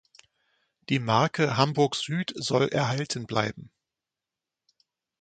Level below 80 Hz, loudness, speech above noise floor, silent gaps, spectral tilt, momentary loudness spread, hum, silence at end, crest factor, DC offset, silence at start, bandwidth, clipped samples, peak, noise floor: -64 dBFS; -26 LUFS; 63 dB; none; -5 dB/octave; 7 LU; none; 1.55 s; 24 dB; under 0.1%; 0.9 s; 9.4 kHz; under 0.1%; -6 dBFS; -89 dBFS